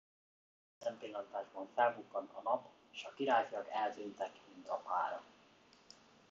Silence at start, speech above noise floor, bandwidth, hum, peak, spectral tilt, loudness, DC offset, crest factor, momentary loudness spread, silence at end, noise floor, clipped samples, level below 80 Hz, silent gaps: 0.8 s; 27 dB; 7.6 kHz; none; -20 dBFS; -1.5 dB/octave; -40 LUFS; under 0.1%; 22 dB; 15 LU; 1.05 s; -66 dBFS; under 0.1%; -88 dBFS; none